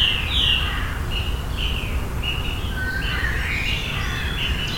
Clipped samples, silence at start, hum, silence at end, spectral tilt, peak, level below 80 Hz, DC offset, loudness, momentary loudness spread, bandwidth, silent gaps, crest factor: under 0.1%; 0 s; none; 0 s; -4 dB/octave; -4 dBFS; -28 dBFS; under 0.1%; -23 LUFS; 8 LU; 17 kHz; none; 18 dB